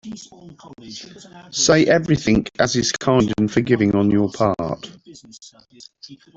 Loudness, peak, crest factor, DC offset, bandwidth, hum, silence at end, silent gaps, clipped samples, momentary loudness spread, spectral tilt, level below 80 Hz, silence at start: -18 LUFS; -2 dBFS; 18 dB; under 0.1%; 8.2 kHz; none; 0.2 s; none; under 0.1%; 21 LU; -4.5 dB/octave; -46 dBFS; 0.05 s